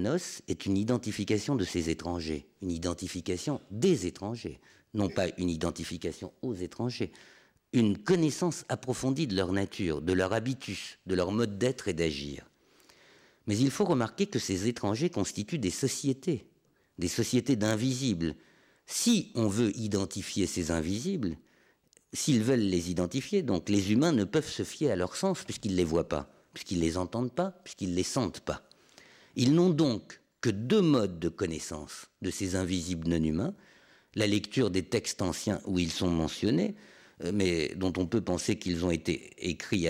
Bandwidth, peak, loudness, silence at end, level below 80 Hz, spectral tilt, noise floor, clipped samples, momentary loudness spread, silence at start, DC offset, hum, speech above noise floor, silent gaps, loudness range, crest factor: 16 kHz; -16 dBFS; -31 LUFS; 0 s; -58 dBFS; -5 dB/octave; -68 dBFS; under 0.1%; 11 LU; 0 s; under 0.1%; none; 38 dB; none; 4 LU; 14 dB